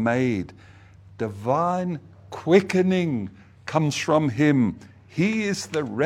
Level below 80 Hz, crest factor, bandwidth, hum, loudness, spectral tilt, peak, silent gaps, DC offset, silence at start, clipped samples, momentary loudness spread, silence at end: -60 dBFS; 20 dB; 13.5 kHz; none; -23 LUFS; -6 dB/octave; -4 dBFS; none; under 0.1%; 0 s; under 0.1%; 16 LU; 0 s